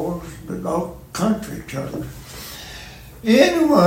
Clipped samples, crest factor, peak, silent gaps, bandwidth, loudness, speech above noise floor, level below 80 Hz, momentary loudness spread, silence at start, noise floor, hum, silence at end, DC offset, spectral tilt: under 0.1%; 20 dB; 0 dBFS; none; 16.5 kHz; -21 LUFS; 21 dB; -44 dBFS; 20 LU; 0 s; -38 dBFS; none; 0 s; under 0.1%; -5.5 dB/octave